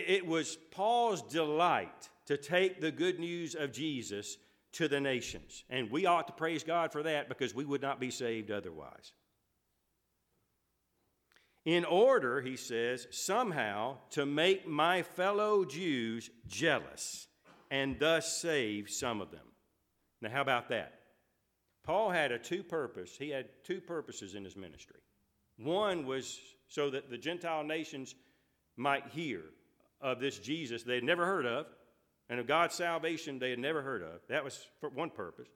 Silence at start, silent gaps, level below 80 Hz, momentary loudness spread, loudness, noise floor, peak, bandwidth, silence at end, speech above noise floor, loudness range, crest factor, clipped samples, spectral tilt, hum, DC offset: 0 s; none; -72 dBFS; 14 LU; -35 LUFS; -81 dBFS; -14 dBFS; 16.5 kHz; 0.1 s; 46 dB; 7 LU; 22 dB; under 0.1%; -4 dB/octave; none; under 0.1%